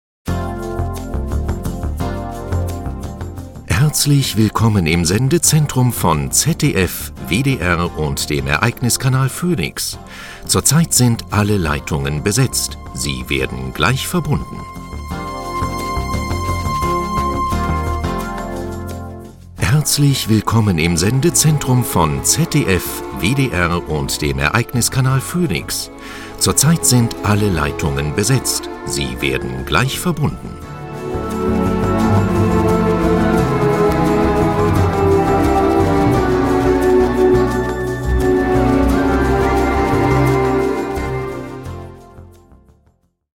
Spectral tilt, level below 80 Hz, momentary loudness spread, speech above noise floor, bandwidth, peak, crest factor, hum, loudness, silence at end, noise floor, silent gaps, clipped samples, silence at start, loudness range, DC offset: -5 dB/octave; -28 dBFS; 12 LU; 42 dB; 17 kHz; 0 dBFS; 16 dB; none; -16 LUFS; 1.1 s; -58 dBFS; none; under 0.1%; 0.25 s; 6 LU; under 0.1%